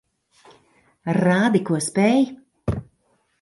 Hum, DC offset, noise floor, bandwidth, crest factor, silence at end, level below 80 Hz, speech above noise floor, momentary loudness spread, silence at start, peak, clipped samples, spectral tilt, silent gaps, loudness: none; under 0.1%; -66 dBFS; 11.5 kHz; 18 dB; 0.6 s; -46 dBFS; 47 dB; 13 LU; 1.05 s; -6 dBFS; under 0.1%; -6 dB/octave; none; -21 LUFS